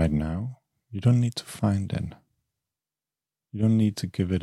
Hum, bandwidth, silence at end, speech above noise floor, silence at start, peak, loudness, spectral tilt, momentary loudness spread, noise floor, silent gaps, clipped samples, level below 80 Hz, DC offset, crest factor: none; 12.5 kHz; 0 s; over 65 dB; 0 s; -10 dBFS; -26 LUFS; -7.5 dB/octave; 15 LU; under -90 dBFS; none; under 0.1%; -48 dBFS; under 0.1%; 18 dB